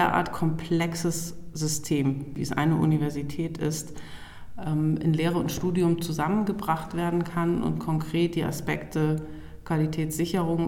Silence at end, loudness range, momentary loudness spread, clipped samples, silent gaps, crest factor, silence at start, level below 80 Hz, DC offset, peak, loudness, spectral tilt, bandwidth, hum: 0 s; 2 LU; 8 LU; under 0.1%; none; 18 dB; 0 s; -48 dBFS; under 0.1%; -10 dBFS; -27 LUFS; -6 dB/octave; 17 kHz; none